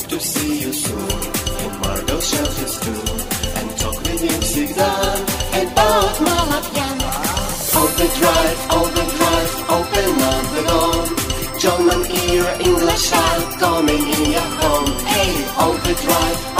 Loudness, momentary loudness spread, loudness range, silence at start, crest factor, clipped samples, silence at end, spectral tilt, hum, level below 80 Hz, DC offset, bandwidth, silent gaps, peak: -17 LUFS; 7 LU; 4 LU; 0 s; 16 dB; under 0.1%; 0 s; -3.5 dB/octave; none; -28 dBFS; under 0.1%; 16 kHz; none; -2 dBFS